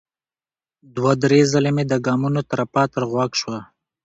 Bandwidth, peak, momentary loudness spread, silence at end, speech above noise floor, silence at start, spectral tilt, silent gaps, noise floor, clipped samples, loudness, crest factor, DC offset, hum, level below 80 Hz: 8 kHz; -2 dBFS; 10 LU; 0.4 s; over 71 dB; 0.95 s; -6 dB/octave; none; under -90 dBFS; under 0.1%; -19 LUFS; 18 dB; under 0.1%; none; -56 dBFS